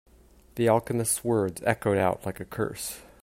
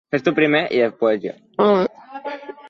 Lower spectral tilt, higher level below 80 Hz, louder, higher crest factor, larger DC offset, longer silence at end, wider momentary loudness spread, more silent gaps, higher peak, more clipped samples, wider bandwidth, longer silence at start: second, -5 dB/octave vs -7 dB/octave; first, -56 dBFS vs -64 dBFS; second, -27 LUFS vs -19 LUFS; first, 22 dB vs 16 dB; neither; first, 0.2 s vs 0 s; second, 11 LU vs 15 LU; neither; about the same, -6 dBFS vs -4 dBFS; neither; first, 16 kHz vs 7 kHz; first, 0.55 s vs 0.1 s